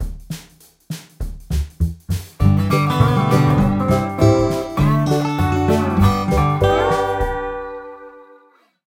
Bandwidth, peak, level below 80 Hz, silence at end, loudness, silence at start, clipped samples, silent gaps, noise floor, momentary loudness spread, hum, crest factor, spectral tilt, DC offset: 16.5 kHz; 0 dBFS; -30 dBFS; 0.65 s; -17 LUFS; 0 s; under 0.1%; none; -54 dBFS; 17 LU; none; 18 dB; -7 dB/octave; under 0.1%